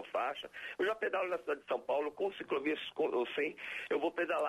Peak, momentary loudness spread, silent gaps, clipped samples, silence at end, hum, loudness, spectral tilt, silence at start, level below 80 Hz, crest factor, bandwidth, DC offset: -24 dBFS; 5 LU; none; under 0.1%; 0 s; none; -36 LUFS; -4.5 dB/octave; 0 s; -78 dBFS; 12 dB; 13.5 kHz; under 0.1%